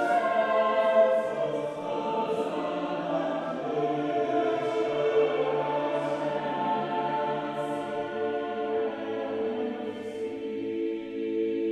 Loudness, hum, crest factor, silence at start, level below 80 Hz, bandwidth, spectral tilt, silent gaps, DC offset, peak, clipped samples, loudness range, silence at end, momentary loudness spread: -29 LUFS; none; 16 dB; 0 s; -70 dBFS; 11 kHz; -6 dB/octave; none; under 0.1%; -12 dBFS; under 0.1%; 5 LU; 0 s; 8 LU